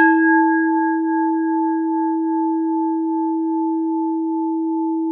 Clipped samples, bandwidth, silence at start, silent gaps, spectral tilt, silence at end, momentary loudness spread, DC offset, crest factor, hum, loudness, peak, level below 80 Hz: under 0.1%; 2.8 kHz; 0 s; none; -8.5 dB/octave; 0 s; 6 LU; under 0.1%; 14 dB; none; -19 LUFS; -4 dBFS; -78 dBFS